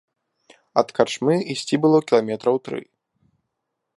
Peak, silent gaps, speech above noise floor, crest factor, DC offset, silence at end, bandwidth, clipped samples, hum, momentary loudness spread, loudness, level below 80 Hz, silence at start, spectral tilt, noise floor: -2 dBFS; none; 59 dB; 22 dB; under 0.1%; 1.15 s; 11.5 kHz; under 0.1%; none; 8 LU; -21 LUFS; -70 dBFS; 0.75 s; -5.5 dB/octave; -79 dBFS